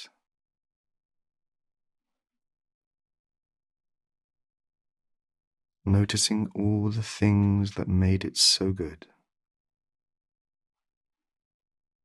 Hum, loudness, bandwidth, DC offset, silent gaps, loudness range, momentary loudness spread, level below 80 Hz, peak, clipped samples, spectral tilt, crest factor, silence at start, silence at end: none; -25 LUFS; 12 kHz; under 0.1%; 0.76-0.84 s, 1.05-1.09 s, 2.74-2.91 s, 3.19-3.24 s, 4.24-4.29 s, 5.47-5.51 s; 10 LU; 10 LU; -56 dBFS; -10 dBFS; under 0.1%; -4.5 dB/octave; 22 dB; 0 s; 3.1 s